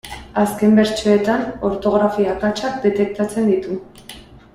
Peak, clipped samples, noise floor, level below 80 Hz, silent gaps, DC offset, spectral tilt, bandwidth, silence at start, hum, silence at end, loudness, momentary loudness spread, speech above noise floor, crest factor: -4 dBFS; under 0.1%; -40 dBFS; -46 dBFS; none; under 0.1%; -6 dB/octave; 15.5 kHz; 0.05 s; none; 0.15 s; -18 LUFS; 14 LU; 23 dB; 14 dB